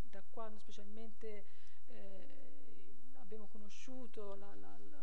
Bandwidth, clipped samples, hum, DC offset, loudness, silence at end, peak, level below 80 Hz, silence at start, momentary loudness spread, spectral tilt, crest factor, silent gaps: 15 kHz; under 0.1%; none; 3%; -56 LUFS; 0 s; -28 dBFS; -76 dBFS; 0 s; 13 LU; -6 dB/octave; 18 dB; none